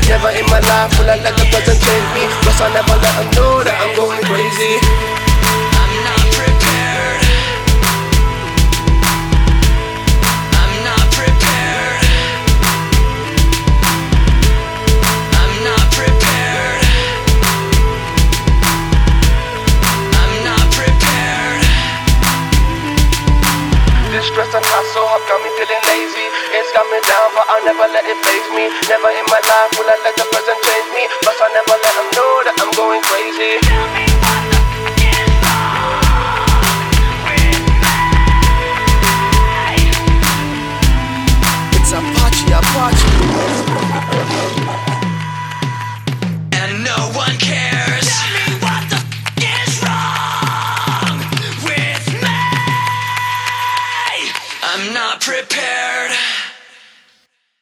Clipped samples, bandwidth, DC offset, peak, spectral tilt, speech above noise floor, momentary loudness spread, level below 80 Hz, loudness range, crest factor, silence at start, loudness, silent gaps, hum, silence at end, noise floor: under 0.1%; over 20 kHz; under 0.1%; 0 dBFS; -4 dB/octave; 46 dB; 5 LU; -16 dBFS; 4 LU; 12 dB; 0 s; -13 LUFS; none; none; 1.05 s; -58 dBFS